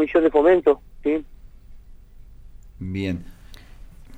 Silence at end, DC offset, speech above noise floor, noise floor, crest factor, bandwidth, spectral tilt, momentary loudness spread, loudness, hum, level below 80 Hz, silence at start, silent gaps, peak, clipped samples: 0 s; under 0.1%; 23 dB; -43 dBFS; 18 dB; 8.8 kHz; -8 dB/octave; 16 LU; -21 LUFS; none; -44 dBFS; 0 s; none; -6 dBFS; under 0.1%